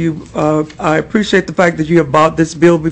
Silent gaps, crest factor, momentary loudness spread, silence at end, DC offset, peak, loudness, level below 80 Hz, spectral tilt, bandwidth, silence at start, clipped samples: none; 12 dB; 5 LU; 0 s; under 0.1%; 0 dBFS; -13 LUFS; -40 dBFS; -6 dB/octave; 8.6 kHz; 0 s; under 0.1%